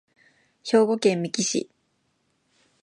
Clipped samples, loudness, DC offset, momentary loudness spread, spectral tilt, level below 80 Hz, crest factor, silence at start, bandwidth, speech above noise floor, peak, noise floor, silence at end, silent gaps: under 0.1%; -23 LUFS; under 0.1%; 16 LU; -4 dB/octave; -76 dBFS; 20 dB; 0.65 s; 11.5 kHz; 49 dB; -6 dBFS; -71 dBFS; 1.2 s; none